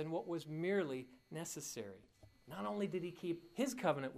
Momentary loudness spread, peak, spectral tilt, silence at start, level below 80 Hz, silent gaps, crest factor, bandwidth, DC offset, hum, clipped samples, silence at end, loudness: 12 LU; -22 dBFS; -5 dB/octave; 0 s; -78 dBFS; none; 20 dB; 15.5 kHz; under 0.1%; none; under 0.1%; 0 s; -42 LUFS